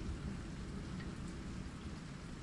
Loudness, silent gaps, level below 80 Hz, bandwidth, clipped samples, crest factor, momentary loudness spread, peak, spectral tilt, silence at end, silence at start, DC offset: -47 LUFS; none; -50 dBFS; 11.5 kHz; under 0.1%; 14 dB; 3 LU; -32 dBFS; -6 dB/octave; 0 s; 0 s; under 0.1%